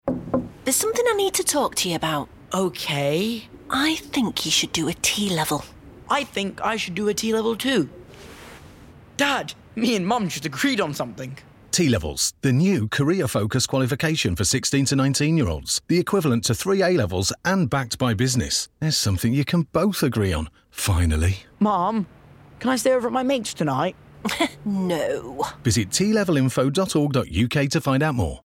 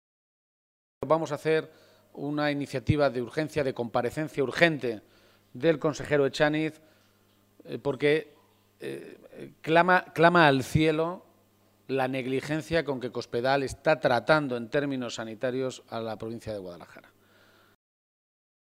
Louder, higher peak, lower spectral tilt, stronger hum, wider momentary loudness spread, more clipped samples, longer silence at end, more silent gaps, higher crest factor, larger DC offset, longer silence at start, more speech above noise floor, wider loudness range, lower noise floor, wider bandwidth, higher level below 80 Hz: first, -22 LUFS vs -27 LUFS; second, -8 dBFS vs -4 dBFS; second, -4.5 dB/octave vs -6 dB/octave; neither; second, 7 LU vs 17 LU; neither; second, 0.05 s vs 1.75 s; neither; second, 14 dB vs 26 dB; neither; second, 0.05 s vs 1 s; second, 24 dB vs 37 dB; second, 4 LU vs 8 LU; second, -46 dBFS vs -64 dBFS; about the same, 17 kHz vs 16 kHz; first, -44 dBFS vs -56 dBFS